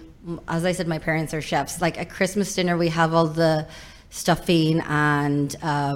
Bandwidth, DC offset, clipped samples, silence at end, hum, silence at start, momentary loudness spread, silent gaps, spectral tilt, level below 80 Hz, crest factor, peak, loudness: 16.5 kHz; under 0.1%; under 0.1%; 0 s; none; 0 s; 8 LU; none; -5.5 dB/octave; -48 dBFS; 16 dB; -6 dBFS; -23 LUFS